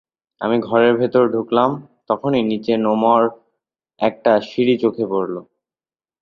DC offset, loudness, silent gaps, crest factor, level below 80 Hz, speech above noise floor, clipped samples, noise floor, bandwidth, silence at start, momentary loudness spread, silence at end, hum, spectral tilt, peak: under 0.1%; -18 LUFS; none; 16 dB; -62 dBFS; over 73 dB; under 0.1%; under -90 dBFS; 6.8 kHz; 0.4 s; 8 LU; 0.8 s; none; -8 dB/octave; -2 dBFS